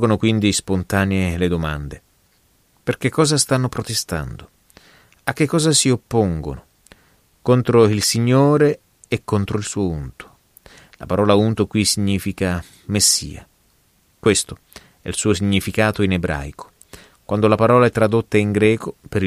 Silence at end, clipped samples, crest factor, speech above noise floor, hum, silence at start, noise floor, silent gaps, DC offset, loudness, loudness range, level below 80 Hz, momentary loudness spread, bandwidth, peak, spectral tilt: 0 s; under 0.1%; 18 dB; 41 dB; none; 0 s; -59 dBFS; none; under 0.1%; -18 LUFS; 4 LU; -42 dBFS; 14 LU; 15.5 kHz; 0 dBFS; -4.5 dB/octave